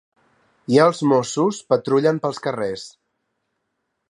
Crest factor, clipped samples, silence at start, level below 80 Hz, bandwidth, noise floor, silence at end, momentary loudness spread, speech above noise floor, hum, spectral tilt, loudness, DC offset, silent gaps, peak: 20 dB; under 0.1%; 0.7 s; -66 dBFS; 11 kHz; -75 dBFS; 1.2 s; 14 LU; 56 dB; none; -5.5 dB/octave; -19 LUFS; under 0.1%; none; -2 dBFS